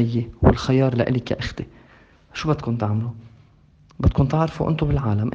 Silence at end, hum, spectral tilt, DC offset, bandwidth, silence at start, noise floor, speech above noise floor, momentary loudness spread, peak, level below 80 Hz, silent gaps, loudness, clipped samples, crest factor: 0 s; none; -8 dB/octave; under 0.1%; 7.6 kHz; 0 s; -53 dBFS; 33 dB; 13 LU; 0 dBFS; -34 dBFS; none; -22 LUFS; under 0.1%; 22 dB